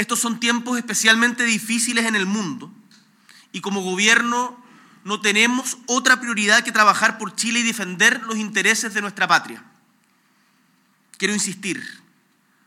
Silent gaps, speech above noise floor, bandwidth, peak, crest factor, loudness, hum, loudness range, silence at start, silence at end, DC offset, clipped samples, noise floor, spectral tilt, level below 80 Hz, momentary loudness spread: none; 41 dB; 16.5 kHz; 0 dBFS; 22 dB; -18 LUFS; none; 6 LU; 0 s; 0.7 s; under 0.1%; under 0.1%; -61 dBFS; -2 dB/octave; -84 dBFS; 13 LU